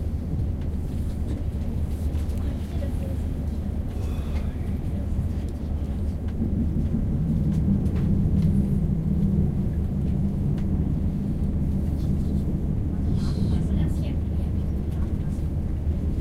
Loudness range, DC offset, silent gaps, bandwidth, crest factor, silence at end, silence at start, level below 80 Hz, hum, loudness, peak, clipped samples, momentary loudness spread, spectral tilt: 5 LU; under 0.1%; none; 11.5 kHz; 14 dB; 0 s; 0 s; -28 dBFS; none; -26 LUFS; -10 dBFS; under 0.1%; 6 LU; -9.5 dB/octave